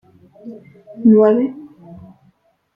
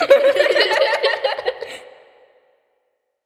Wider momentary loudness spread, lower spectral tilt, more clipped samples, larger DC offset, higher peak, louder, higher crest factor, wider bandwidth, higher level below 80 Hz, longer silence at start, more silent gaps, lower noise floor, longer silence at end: first, 26 LU vs 19 LU; first, -11 dB/octave vs -1.5 dB/octave; neither; neither; about the same, -2 dBFS vs 0 dBFS; about the same, -14 LUFS vs -16 LUFS; about the same, 16 dB vs 18 dB; second, 3.2 kHz vs 14 kHz; first, -60 dBFS vs -68 dBFS; first, 0.45 s vs 0 s; neither; second, -58 dBFS vs -70 dBFS; second, 1.1 s vs 1.4 s